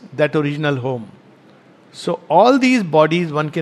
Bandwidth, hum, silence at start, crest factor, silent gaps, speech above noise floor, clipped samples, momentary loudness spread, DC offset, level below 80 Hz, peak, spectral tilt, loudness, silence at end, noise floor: 12 kHz; none; 0.05 s; 18 dB; none; 32 dB; under 0.1%; 13 LU; under 0.1%; -68 dBFS; 0 dBFS; -6.5 dB/octave; -16 LUFS; 0 s; -47 dBFS